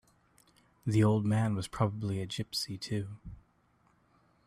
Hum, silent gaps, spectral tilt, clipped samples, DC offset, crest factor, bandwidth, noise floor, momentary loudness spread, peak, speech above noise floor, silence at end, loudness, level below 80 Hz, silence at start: none; none; -6.5 dB/octave; under 0.1%; under 0.1%; 18 dB; 14 kHz; -69 dBFS; 14 LU; -16 dBFS; 38 dB; 1.1 s; -32 LUFS; -60 dBFS; 0.85 s